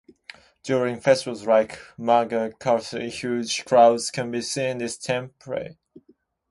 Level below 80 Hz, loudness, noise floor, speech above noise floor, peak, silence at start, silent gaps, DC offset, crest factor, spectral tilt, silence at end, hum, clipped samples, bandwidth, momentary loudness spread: -64 dBFS; -23 LUFS; -61 dBFS; 38 dB; -4 dBFS; 0.65 s; none; under 0.1%; 20 dB; -4 dB/octave; 0.8 s; none; under 0.1%; 11.5 kHz; 14 LU